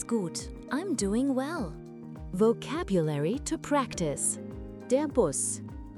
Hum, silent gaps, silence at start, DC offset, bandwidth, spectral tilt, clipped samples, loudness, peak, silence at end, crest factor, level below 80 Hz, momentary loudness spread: none; none; 0 s; under 0.1%; 13.5 kHz; -5 dB/octave; under 0.1%; -30 LUFS; -12 dBFS; 0 s; 18 dB; -48 dBFS; 12 LU